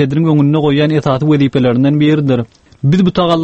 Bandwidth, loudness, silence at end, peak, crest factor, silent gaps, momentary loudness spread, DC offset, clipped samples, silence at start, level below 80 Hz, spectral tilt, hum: 7.8 kHz; -12 LUFS; 0 s; 0 dBFS; 12 dB; none; 5 LU; under 0.1%; under 0.1%; 0 s; -44 dBFS; -8.5 dB/octave; none